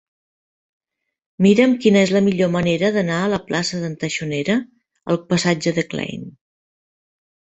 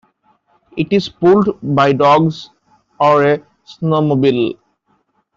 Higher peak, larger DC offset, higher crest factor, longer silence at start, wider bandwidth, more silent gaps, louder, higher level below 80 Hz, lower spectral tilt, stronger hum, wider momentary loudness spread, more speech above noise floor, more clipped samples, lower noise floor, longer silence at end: about the same, -2 dBFS vs -2 dBFS; neither; about the same, 18 dB vs 14 dB; first, 1.4 s vs 0.75 s; about the same, 8.2 kHz vs 7.6 kHz; neither; second, -18 LUFS vs -14 LUFS; about the same, -56 dBFS vs -54 dBFS; second, -5.5 dB/octave vs -7.5 dB/octave; neither; about the same, 11 LU vs 12 LU; first, over 72 dB vs 49 dB; neither; first, under -90 dBFS vs -62 dBFS; first, 1.25 s vs 0.85 s